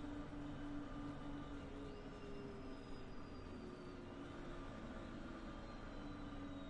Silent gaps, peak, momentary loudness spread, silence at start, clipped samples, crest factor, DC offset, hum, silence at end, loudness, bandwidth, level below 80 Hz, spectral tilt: none; -36 dBFS; 4 LU; 0 s; under 0.1%; 14 dB; under 0.1%; none; 0 s; -52 LUFS; 10.5 kHz; -56 dBFS; -6.5 dB/octave